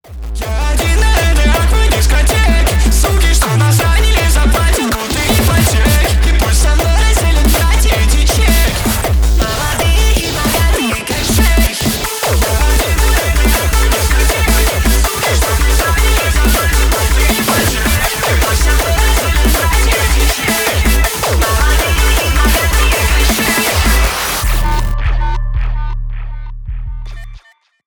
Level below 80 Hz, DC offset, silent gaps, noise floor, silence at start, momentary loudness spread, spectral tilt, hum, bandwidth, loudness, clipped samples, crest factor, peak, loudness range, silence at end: -12 dBFS; under 0.1%; none; -42 dBFS; 0.1 s; 6 LU; -4 dB/octave; none; over 20 kHz; -12 LUFS; under 0.1%; 10 dB; 0 dBFS; 2 LU; 0.5 s